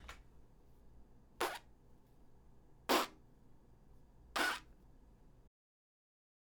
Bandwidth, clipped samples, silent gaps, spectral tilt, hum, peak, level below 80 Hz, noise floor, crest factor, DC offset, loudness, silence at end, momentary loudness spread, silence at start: over 20 kHz; under 0.1%; none; -2 dB/octave; none; -18 dBFS; -64 dBFS; -63 dBFS; 28 dB; under 0.1%; -39 LUFS; 1.15 s; 17 LU; 0 s